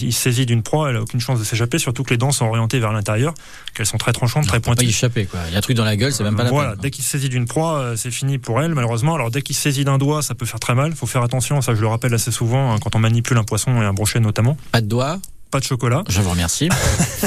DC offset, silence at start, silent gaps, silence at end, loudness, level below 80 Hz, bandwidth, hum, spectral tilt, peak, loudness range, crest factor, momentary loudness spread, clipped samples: under 0.1%; 0 s; none; 0 s; -18 LUFS; -38 dBFS; 15 kHz; none; -4.5 dB/octave; -4 dBFS; 1 LU; 14 dB; 5 LU; under 0.1%